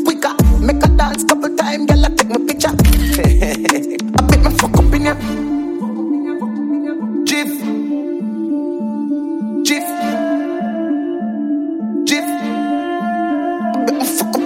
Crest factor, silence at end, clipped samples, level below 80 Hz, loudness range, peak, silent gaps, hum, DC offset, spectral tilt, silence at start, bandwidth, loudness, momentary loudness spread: 14 dB; 0 s; under 0.1%; -20 dBFS; 5 LU; 0 dBFS; none; none; under 0.1%; -5 dB/octave; 0 s; 16.5 kHz; -16 LUFS; 8 LU